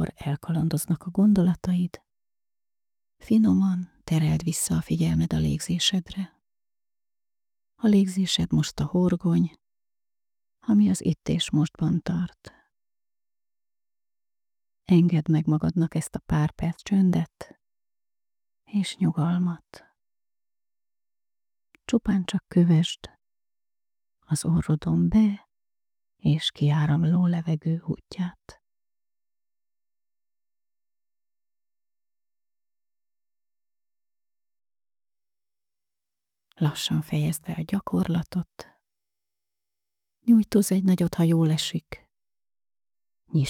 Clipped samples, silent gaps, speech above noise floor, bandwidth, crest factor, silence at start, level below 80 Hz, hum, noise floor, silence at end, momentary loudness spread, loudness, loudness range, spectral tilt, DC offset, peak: under 0.1%; none; over 66 dB; 15.5 kHz; 18 dB; 0 s; -52 dBFS; none; under -90 dBFS; 0 s; 11 LU; -24 LUFS; 6 LU; -6 dB/octave; under 0.1%; -8 dBFS